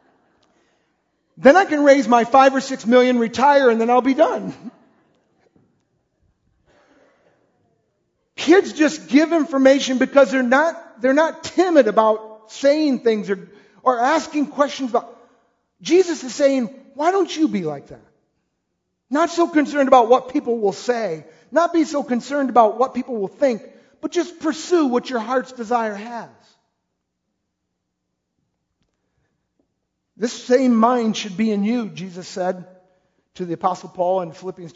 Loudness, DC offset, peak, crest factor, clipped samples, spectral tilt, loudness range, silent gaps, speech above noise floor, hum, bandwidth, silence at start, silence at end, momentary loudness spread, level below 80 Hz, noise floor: -18 LUFS; under 0.1%; 0 dBFS; 20 dB; under 0.1%; -4.5 dB/octave; 8 LU; none; 59 dB; none; 8 kHz; 1.4 s; 0.05 s; 13 LU; -66 dBFS; -76 dBFS